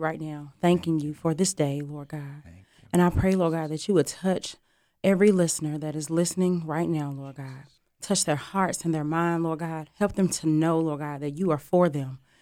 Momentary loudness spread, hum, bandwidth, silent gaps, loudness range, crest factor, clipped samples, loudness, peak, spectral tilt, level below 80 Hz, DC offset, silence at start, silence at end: 14 LU; none; 16 kHz; none; 3 LU; 16 dB; under 0.1%; -26 LUFS; -8 dBFS; -5.5 dB/octave; -50 dBFS; under 0.1%; 0 s; 0.25 s